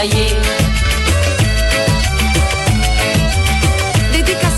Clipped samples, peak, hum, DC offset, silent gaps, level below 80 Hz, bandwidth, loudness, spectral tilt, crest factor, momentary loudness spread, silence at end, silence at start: under 0.1%; -4 dBFS; none; under 0.1%; none; -18 dBFS; 16 kHz; -14 LUFS; -4 dB/octave; 10 dB; 1 LU; 0 s; 0 s